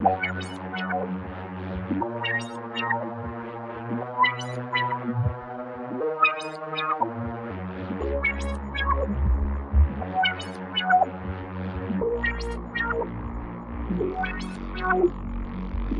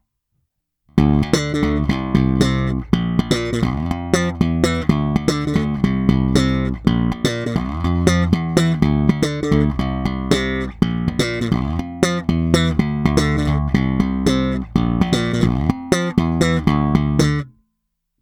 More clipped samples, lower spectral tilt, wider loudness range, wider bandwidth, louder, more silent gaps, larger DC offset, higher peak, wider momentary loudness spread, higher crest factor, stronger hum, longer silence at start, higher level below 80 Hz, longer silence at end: neither; about the same, -6.5 dB/octave vs -6.5 dB/octave; first, 4 LU vs 1 LU; second, 11 kHz vs 15 kHz; second, -27 LUFS vs -18 LUFS; neither; neither; second, -6 dBFS vs 0 dBFS; first, 11 LU vs 4 LU; about the same, 20 dB vs 18 dB; neither; second, 0 s vs 0.95 s; about the same, -34 dBFS vs -30 dBFS; second, 0 s vs 0.75 s